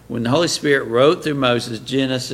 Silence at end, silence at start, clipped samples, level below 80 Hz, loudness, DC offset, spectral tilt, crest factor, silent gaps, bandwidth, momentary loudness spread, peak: 0 s; 0.1 s; under 0.1%; -52 dBFS; -18 LUFS; under 0.1%; -4.5 dB/octave; 16 dB; none; 16 kHz; 6 LU; -2 dBFS